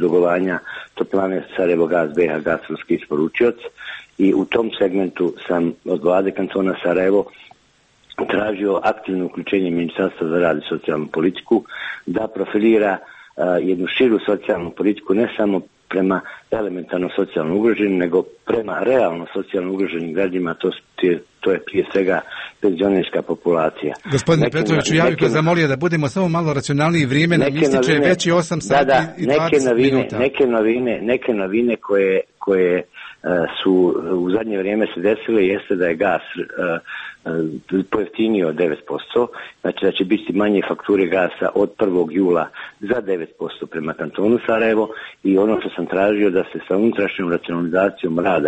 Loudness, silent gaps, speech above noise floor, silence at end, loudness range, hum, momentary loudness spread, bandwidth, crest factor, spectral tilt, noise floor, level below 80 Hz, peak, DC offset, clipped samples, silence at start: -19 LUFS; none; 39 dB; 0 s; 4 LU; none; 8 LU; 8.4 kHz; 14 dB; -6 dB/octave; -57 dBFS; -54 dBFS; -4 dBFS; under 0.1%; under 0.1%; 0 s